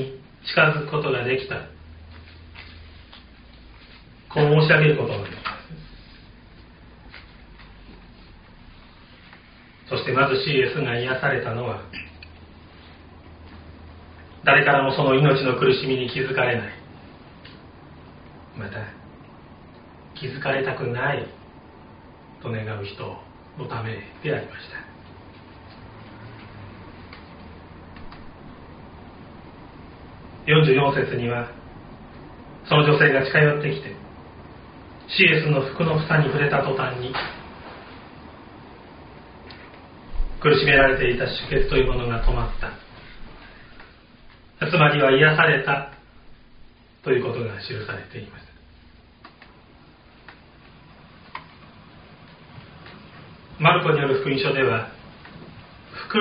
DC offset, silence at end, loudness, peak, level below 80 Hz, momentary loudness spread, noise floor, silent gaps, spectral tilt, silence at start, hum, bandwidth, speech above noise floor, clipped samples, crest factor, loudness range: under 0.1%; 0 s; -21 LUFS; -2 dBFS; -40 dBFS; 28 LU; -50 dBFS; none; -4 dB/octave; 0 s; none; 5.2 kHz; 30 dB; under 0.1%; 22 dB; 19 LU